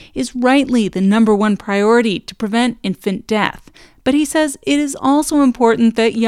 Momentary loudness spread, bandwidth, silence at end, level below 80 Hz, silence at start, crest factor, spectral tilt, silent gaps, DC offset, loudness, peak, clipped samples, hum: 8 LU; 14.5 kHz; 0 s; -46 dBFS; 0 s; 14 dB; -5 dB/octave; none; under 0.1%; -15 LUFS; 0 dBFS; under 0.1%; none